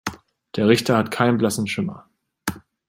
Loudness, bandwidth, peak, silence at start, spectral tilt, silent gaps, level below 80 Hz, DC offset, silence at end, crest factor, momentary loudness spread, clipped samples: -21 LUFS; 16 kHz; -2 dBFS; 0.05 s; -5.5 dB/octave; none; -58 dBFS; under 0.1%; 0.3 s; 20 dB; 13 LU; under 0.1%